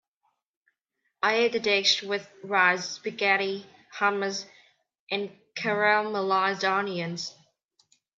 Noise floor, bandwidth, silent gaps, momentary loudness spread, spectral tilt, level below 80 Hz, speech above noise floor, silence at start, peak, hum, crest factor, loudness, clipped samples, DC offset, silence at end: -79 dBFS; 7.8 kHz; 5.00-5.07 s; 13 LU; -3 dB/octave; -82 dBFS; 53 dB; 1.2 s; -8 dBFS; none; 22 dB; -26 LUFS; under 0.1%; under 0.1%; 0.85 s